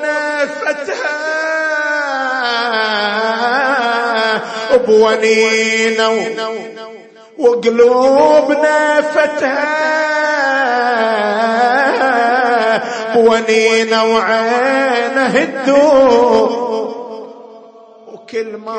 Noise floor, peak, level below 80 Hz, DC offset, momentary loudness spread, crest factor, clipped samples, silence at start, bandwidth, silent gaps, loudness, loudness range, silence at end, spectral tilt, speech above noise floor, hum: -39 dBFS; 0 dBFS; -58 dBFS; under 0.1%; 9 LU; 12 dB; under 0.1%; 0 s; 8.8 kHz; none; -13 LUFS; 3 LU; 0 s; -3 dB/octave; 27 dB; none